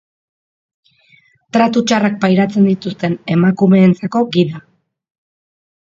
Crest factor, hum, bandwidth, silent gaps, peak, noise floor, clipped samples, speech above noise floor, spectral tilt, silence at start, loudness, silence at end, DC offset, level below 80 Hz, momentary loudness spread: 16 dB; none; 7.6 kHz; none; 0 dBFS; -52 dBFS; under 0.1%; 39 dB; -7 dB/octave; 1.55 s; -14 LUFS; 1.35 s; under 0.1%; -58 dBFS; 9 LU